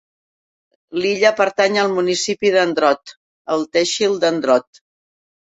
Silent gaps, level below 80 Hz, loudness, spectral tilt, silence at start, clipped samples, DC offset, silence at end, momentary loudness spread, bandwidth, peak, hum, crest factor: 3.16-3.45 s; -66 dBFS; -17 LUFS; -3 dB/octave; 0.9 s; under 0.1%; under 0.1%; 0.95 s; 8 LU; 8.4 kHz; -2 dBFS; none; 18 dB